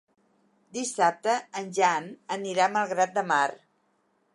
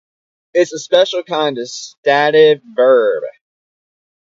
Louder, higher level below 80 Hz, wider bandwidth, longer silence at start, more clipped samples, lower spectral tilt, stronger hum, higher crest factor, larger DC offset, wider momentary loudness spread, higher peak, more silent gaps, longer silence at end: second, -27 LUFS vs -14 LUFS; second, -84 dBFS vs -70 dBFS; first, 11.5 kHz vs 7.8 kHz; first, 0.75 s vs 0.55 s; neither; about the same, -3 dB/octave vs -3.5 dB/octave; neither; about the same, 20 dB vs 16 dB; neither; second, 9 LU vs 13 LU; second, -8 dBFS vs 0 dBFS; second, none vs 1.98-2.03 s; second, 0.8 s vs 1 s